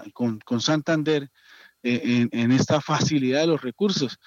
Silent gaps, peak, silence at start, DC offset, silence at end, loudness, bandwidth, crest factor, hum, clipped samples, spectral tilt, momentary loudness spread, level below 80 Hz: none; -8 dBFS; 0 s; under 0.1%; 0.1 s; -23 LUFS; 7.6 kHz; 16 dB; none; under 0.1%; -5.5 dB/octave; 6 LU; -70 dBFS